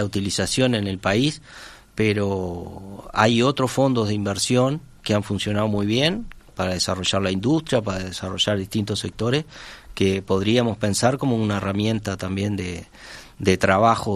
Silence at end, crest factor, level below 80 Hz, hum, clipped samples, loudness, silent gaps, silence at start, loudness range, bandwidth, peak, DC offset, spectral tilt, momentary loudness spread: 0 s; 20 dB; -48 dBFS; none; under 0.1%; -22 LUFS; none; 0 s; 2 LU; 13.5 kHz; -2 dBFS; under 0.1%; -5 dB/octave; 15 LU